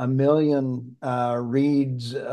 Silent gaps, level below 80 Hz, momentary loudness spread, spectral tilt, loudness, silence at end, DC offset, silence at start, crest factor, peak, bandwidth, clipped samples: none; -68 dBFS; 10 LU; -8.5 dB/octave; -23 LUFS; 0 s; under 0.1%; 0 s; 16 dB; -8 dBFS; 10 kHz; under 0.1%